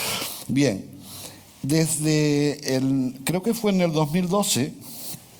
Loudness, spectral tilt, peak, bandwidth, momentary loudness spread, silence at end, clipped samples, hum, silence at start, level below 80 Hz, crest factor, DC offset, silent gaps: -23 LUFS; -5 dB/octave; -6 dBFS; over 20 kHz; 14 LU; 0.15 s; under 0.1%; none; 0 s; -56 dBFS; 18 dB; under 0.1%; none